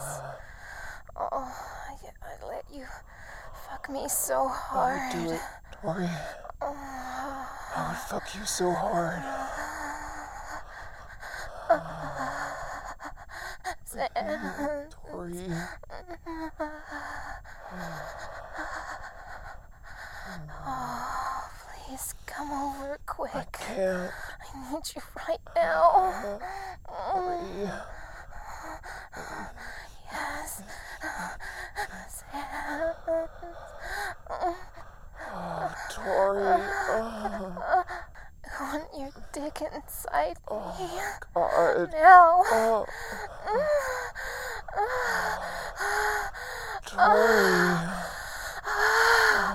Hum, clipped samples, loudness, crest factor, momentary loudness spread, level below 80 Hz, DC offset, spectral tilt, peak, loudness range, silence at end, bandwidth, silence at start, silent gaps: none; under 0.1%; -28 LUFS; 26 dB; 19 LU; -48 dBFS; under 0.1%; -3.5 dB/octave; -2 dBFS; 16 LU; 0 s; 16.5 kHz; 0 s; none